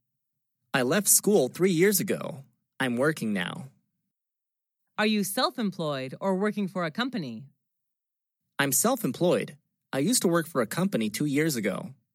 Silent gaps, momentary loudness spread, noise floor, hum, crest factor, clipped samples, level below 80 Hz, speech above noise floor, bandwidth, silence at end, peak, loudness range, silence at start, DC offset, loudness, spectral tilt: none; 13 LU; -87 dBFS; none; 22 dB; under 0.1%; -84 dBFS; 61 dB; 16.5 kHz; 0.2 s; -6 dBFS; 6 LU; 0.75 s; under 0.1%; -26 LUFS; -4 dB/octave